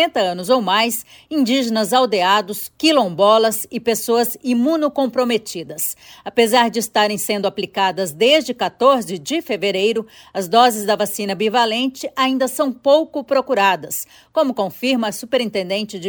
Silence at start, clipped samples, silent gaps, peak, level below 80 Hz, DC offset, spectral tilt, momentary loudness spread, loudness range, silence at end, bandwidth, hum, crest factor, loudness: 0 s; under 0.1%; none; 0 dBFS; -64 dBFS; under 0.1%; -3 dB/octave; 9 LU; 2 LU; 0 s; over 20 kHz; none; 16 dB; -18 LUFS